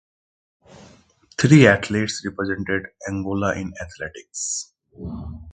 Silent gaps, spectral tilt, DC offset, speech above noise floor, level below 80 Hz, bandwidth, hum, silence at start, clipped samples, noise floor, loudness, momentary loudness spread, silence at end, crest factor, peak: none; -5.5 dB/octave; under 0.1%; 33 dB; -46 dBFS; 9.6 kHz; none; 1.4 s; under 0.1%; -54 dBFS; -20 LUFS; 22 LU; 0 s; 22 dB; 0 dBFS